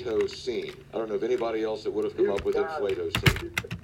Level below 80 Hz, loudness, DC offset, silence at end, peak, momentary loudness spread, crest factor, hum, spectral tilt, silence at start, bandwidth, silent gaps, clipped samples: -46 dBFS; -28 LUFS; under 0.1%; 0.05 s; -4 dBFS; 8 LU; 24 dB; none; -5.5 dB/octave; 0 s; 16.5 kHz; none; under 0.1%